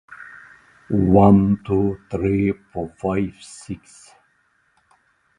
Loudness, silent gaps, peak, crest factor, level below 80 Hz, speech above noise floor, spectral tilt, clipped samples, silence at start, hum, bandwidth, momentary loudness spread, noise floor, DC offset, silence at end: -19 LUFS; none; 0 dBFS; 22 dB; -42 dBFS; 45 dB; -9 dB/octave; under 0.1%; 0.1 s; none; 10.5 kHz; 24 LU; -64 dBFS; under 0.1%; 1.6 s